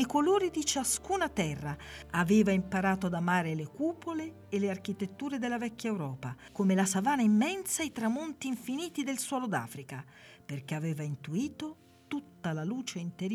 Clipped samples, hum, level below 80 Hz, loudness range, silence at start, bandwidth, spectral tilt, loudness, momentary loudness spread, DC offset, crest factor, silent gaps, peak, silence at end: under 0.1%; none; -60 dBFS; 7 LU; 0 s; 15 kHz; -5 dB/octave; -32 LUFS; 14 LU; under 0.1%; 18 dB; none; -14 dBFS; 0 s